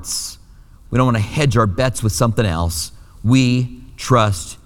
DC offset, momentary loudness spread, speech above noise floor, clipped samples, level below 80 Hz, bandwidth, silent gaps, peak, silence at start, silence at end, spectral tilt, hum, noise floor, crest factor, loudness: under 0.1%; 10 LU; 27 dB; under 0.1%; -36 dBFS; 17.5 kHz; none; -2 dBFS; 0 s; 0.1 s; -5.5 dB/octave; none; -43 dBFS; 16 dB; -17 LUFS